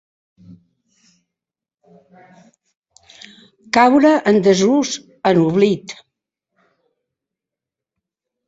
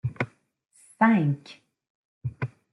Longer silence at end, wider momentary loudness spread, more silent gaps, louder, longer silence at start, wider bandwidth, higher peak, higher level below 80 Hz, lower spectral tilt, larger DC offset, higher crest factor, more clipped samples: first, 2.55 s vs 0.25 s; second, 13 LU vs 16 LU; second, none vs 1.90-2.21 s; first, -15 LUFS vs -26 LUFS; first, 3.75 s vs 0.05 s; second, 8 kHz vs 11.5 kHz; first, -2 dBFS vs -8 dBFS; about the same, -60 dBFS vs -62 dBFS; second, -5.5 dB/octave vs -8 dB/octave; neither; about the same, 18 dB vs 20 dB; neither